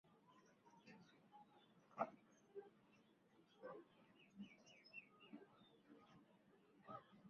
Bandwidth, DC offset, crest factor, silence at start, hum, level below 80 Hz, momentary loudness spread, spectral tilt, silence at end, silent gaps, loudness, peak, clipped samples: 6.6 kHz; under 0.1%; 32 dB; 0.05 s; none; under -90 dBFS; 18 LU; -4 dB/octave; 0 s; none; -59 LUFS; -30 dBFS; under 0.1%